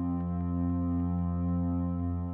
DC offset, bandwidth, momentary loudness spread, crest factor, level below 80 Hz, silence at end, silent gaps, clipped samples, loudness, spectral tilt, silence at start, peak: under 0.1%; 2.5 kHz; 2 LU; 8 dB; -44 dBFS; 0 s; none; under 0.1%; -31 LUFS; -13.5 dB/octave; 0 s; -22 dBFS